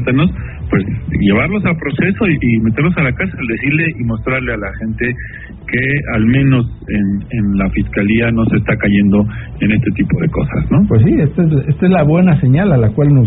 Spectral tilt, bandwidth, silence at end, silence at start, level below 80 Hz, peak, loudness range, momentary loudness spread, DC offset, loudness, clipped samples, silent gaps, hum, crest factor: -7.5 dB/octave; 4 kHz; 0 s; 0 s; -30 dBFS; 0 dBFS; 4 LU; 8 LU; under 0.1%; -14 LUFS; under 0.1%; none; none; 12 dB